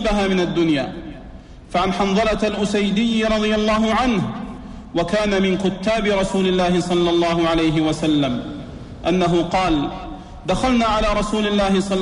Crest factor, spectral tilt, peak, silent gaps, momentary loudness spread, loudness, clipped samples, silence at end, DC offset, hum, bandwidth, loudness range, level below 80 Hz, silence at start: 12 dB; -5.5 dB/octave; -6 dBFS; none; 13 LU; -19 LUFS; under 0.1%; 0 s; under 0.1%; none; 11 kHz; 2 LU; -36 dBFS; 0 s